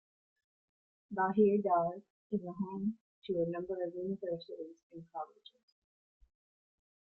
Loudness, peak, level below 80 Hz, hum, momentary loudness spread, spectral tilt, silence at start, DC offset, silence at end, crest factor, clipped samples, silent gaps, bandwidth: -35 LUFS; -16 dBFS; -76 dBFS; none; 19 LU; -10 dB/octave; 1.1 s; under 0.1%; 1.8 s; 20 dB; under 0.1%; 2.10-2.30 s, 3.01-3.22 s, 4.83-4.90 s; 4.3 kHz